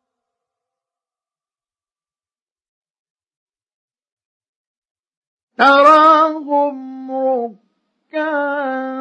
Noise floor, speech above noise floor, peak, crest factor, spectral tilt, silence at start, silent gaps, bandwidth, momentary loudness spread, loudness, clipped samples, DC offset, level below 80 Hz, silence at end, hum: under -90 dBFS; over 78 dB; 0 dBFS; 18 dB; -3.5 dB/octave; 5.6 s; none; 9.6 kHz; 18 LU; -14 LUFS; under 0.1%; under 0.1%; -72 dBFS; 0 s; none